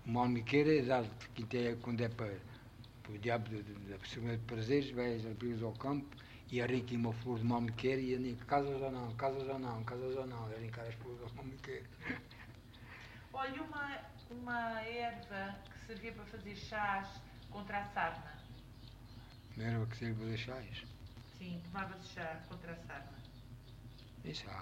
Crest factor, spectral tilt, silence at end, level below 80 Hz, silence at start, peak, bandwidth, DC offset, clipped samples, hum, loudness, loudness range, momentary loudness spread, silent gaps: 22 dB; -7 dB/octave; 0 s; -62 dBFS; 0 s; -18 dBFS; 16 kHz; under 0.1%; under 0.1%; none; -40 LUFS; 8 LU; 19 LU; none